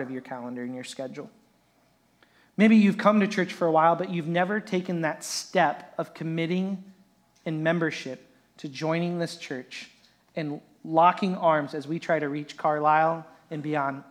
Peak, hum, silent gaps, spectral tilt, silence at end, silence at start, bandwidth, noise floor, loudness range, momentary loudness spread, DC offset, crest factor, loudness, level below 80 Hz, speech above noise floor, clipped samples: -6 dBFS; none; none; -6 dB/octave; 0.1 s; 0 s; 14 kHz; -65 dBFS; 8 LU; 17 LU; under 0.1%; 22 dB; -26 LUFS; -80 dBFS; 39 dB; under 0.1%